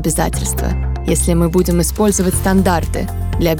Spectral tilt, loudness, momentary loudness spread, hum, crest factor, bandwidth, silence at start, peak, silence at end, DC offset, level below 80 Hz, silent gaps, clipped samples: -5.5 dB/octave; -16 LUFS; 6 LU; none; 14 dB; 19 kHz; 0 s; 0 dBFS; 0 s; under 0.1%; -22 dBFS; none; under 0.1%